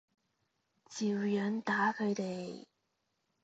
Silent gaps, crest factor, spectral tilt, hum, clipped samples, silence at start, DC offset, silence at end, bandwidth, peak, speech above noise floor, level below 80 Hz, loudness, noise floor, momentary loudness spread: none; 18 dB; -5.5 dB/octave; none; under 0.1%; 0.9 s; under 0.1%; 0.8 s; 8 kHz; -20 dBFS; 48 dB; -82 dBFS; -34 LUFS; -82 dBFS; 15 LU